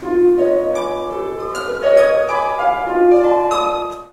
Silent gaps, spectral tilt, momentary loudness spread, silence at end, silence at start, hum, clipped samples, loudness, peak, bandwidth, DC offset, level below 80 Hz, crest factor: none; -5 dB/octave; 11 LU; 0.05 s; 0 s; none; under 0.1%; -16 LUFS; 0 dBFS; 12 kHz; under 0.1%; -46 dBFS; 14 dB